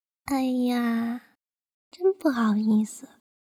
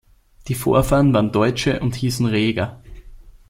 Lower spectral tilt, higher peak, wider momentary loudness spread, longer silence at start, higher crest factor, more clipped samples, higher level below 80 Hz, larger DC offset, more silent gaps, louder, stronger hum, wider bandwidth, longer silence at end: about the same, -6 dB/octave vs -6 dB/octave; second, -10 dBFS vs -2 dBFS; about the same, 10 LU vs 9 LU; second, 0.25 s vs 0.45 s; about the same, 16 dB vs 18 dB; neither; second, -64 dBFS vs -36 dBFS; neither; first, 1.74-1.91 s vs none; second, -25 LUFS vs -19 LUFS; neither; about the same, 15.5 kHz vs 16.5 kHz; first, 0.45 s vs 0.2 s